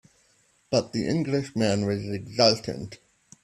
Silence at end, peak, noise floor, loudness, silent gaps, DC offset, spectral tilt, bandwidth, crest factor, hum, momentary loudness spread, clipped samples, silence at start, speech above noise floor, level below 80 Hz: 0.5 s; -4 dBFS; -64 dBFS; -25 LUFS; none; under 0.1%; -5 dB/octave; 13 kHz; 22 dB; none; 13 LU; under 0.1%; 0.7 s; 39 dB; -60 dBFS